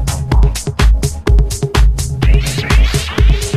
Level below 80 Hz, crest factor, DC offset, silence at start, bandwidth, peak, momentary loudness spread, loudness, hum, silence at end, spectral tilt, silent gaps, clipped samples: -12 dBFS; 12 dB; under 0.1%; 0 s; 14 kHz; 0 dBFS; 3 LU; -14 LUFS; none; 0 s; -5 dB/octave; none; under 0.1%